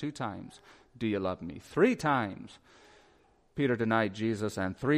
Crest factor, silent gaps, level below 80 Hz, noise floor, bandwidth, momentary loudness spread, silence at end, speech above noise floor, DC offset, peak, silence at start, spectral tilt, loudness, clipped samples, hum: 20 dB; none; -62 dBFS; -65 dBFS; 15 kHz; 18 LU; 0 s; 34 dB; under 0.1%; -12 dBFS; 0 s; -6.5 dB/octave; -31 LUFS; under 0.1%; none